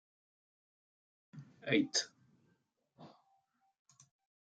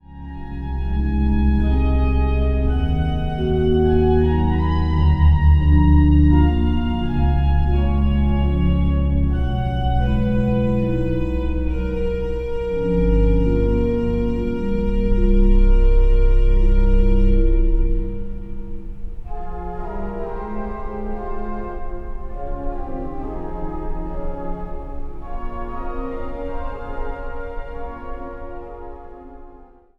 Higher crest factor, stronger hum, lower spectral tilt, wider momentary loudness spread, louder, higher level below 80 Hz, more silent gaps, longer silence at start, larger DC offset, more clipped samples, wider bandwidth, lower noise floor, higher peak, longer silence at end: first, 24 dB vs 14 dB; neither; second, -3 dB/octave vs -10 dB/octave; first, 25 LU vs 17 LU; second, -35 LUFS vs -20 LUFS; second, -84 dBFS vs -20 dBFS; neither; first, 1.35 s vs 0.1 s; neither; neither; first, 9 kHz vs 4.4 kHz; first, -78 dBFS vs -45 dBFS; second, -18 dBFS vs -2 dBFS; first, 1.35 s vs 0.35 s